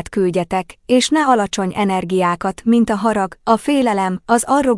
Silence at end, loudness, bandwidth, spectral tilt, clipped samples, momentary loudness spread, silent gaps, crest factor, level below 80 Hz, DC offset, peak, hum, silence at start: 0 s; -17 LUFS; 12 kHz; -5 dB/octave; under 0.1%; 6 LU; none; 12 dB; -48 dBFS; under 0.1%; -4 dBFS; none; 0 s